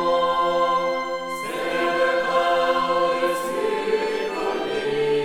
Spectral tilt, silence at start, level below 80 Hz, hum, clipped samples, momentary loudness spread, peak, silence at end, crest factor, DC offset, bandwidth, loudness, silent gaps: -4 dB/octave; 0 s; -54 dBFS; none; under 0.1%; 5 LU; -8 dBFS; 0 s; 14 dB; 0.4%; 16.5 kHz; -22 LUFS; none